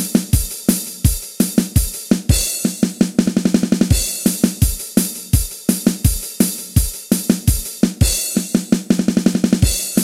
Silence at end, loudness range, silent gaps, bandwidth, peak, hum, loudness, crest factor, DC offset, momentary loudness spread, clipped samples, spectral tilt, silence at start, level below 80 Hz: 0 s; 1 LU; none; 16.5 kHz; 0 dBFS; none; -17 LUFS; 16 dB; under 0.1%; 4 LU; under 0.1%; -5 dB/octave; 0 s; -26 dBFS